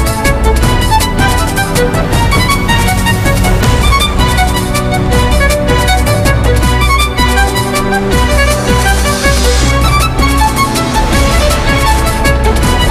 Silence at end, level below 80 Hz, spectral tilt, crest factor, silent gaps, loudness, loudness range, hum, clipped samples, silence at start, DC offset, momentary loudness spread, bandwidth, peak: 0 s; -14 dBFS; -4.5 dB/octave; 10 dB; none; -10 LUFS; 0 LU; none; under 0.1%; 0 s; under 0.1%; 2 LU; 15.5 kHz; 0 dBFS